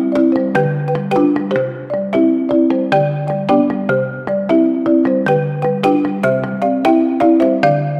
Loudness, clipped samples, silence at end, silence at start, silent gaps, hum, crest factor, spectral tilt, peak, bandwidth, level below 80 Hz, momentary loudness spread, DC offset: -15 LUFS; under 0.1%; 0 s; 0 s; none; none; 14 dB; -8.5 dB/octave; 0 dBFS; 8.6 kHz; -56 dBFS; 6 LU; under 0.1%